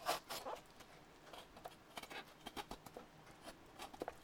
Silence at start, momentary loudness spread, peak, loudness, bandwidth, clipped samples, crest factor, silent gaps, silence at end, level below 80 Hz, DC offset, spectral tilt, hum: 0 s; 13 LU; -26 dBFS; -52 LUFS; over 20 kHz; under 0.1%; 26 dB; none; 0 s; -70 dBFS; under 0.1%; -2.5 dB/octave; none